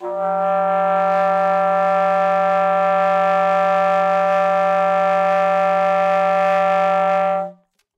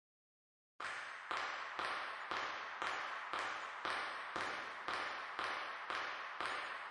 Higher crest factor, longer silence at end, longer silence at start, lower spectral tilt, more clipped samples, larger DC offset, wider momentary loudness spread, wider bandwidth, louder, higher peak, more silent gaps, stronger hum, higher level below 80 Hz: second, 8 dB vs 20 dB; first, 0.45 s vs 0 s; second, 0 s vs 0.8 s; first, -6 dB/octave vs -1.5 dB/octave; neither; neither; about the same, 2 LU vs 3 LU; second, 8.2 kHz vs 11.5 kHz; first, -17 LUFS vs -43 LUFS; first, -8 dBFS vs -24 dBFS; neither; neither; about the same, -84 dBFS vs -82 dBFS